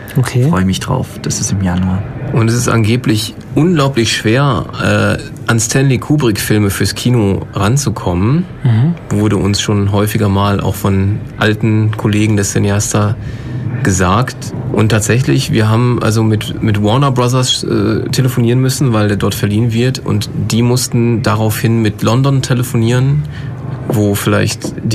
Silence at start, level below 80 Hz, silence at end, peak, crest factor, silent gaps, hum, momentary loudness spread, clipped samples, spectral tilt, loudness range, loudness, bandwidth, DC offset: 0 s; -36 dBFS; 0 s; 0 dBFS; 12 dB; none; none; 5 LU; under 0.1%; -5.5 dB/octave; 1 LU; -13 LUFS; 15.5 kHz; under 0.1%